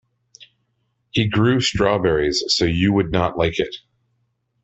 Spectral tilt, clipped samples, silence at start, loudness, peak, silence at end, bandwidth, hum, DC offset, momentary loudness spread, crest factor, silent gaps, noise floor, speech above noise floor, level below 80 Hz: -5 dB/octave; under 0.1%; 0.4 s; -19 LUFS; -4 dBFS; 0.85 s; 8.4 kHz; none; under 0.1%; 8 LU; 18 dB; none; -70 dBFS; 51 dB; -42 dBFS